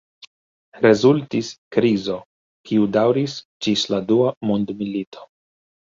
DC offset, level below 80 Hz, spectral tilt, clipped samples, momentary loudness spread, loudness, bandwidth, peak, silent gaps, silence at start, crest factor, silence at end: under 0.1%; -60 dBFS; -6 dB/octave; under 0.1%; 11 LU; -20 LUFS; 7.8 kHz; -2 dBFS; 1.58-1.71 s, 2.26-2.64 s, 3.45-3.60 s, 4.37-4.41 s, 5.07-5.12 s; 0.75 s; 18 dB; 0.6 s